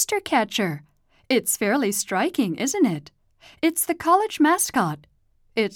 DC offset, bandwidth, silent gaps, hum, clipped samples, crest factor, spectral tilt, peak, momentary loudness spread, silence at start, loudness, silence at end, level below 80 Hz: under 0.1%; 18.5 kHz; none; none; under 0.1%; 16 dB; -3.5 dB/octave; -8 dBFS; 9 LU; 0 s; -22 LUFS; 0 s; -62 dBFS